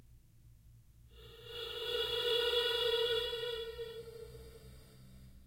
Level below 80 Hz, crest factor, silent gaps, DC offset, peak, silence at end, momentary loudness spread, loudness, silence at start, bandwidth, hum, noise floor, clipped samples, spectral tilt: -60 dBFS; 18 dB; none; under 0.1%; -22 dBFS; 0 s; 23 LU; -35 LUFS; 0.1 s; 16.5 kHz; none; -61 dBFS; under 0.1%; -2.5 dB/octave